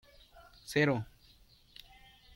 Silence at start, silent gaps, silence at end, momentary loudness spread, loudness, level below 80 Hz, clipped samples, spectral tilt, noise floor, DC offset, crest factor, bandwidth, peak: 0.35 s; none; 1.3 s; 25 LU; -32 LUFS; -64 dBFS; under 0.1%; -6 dB/octave; -63 dBFS; under 0.1%; 22 dB; 16.5 kHz; -16 dBFS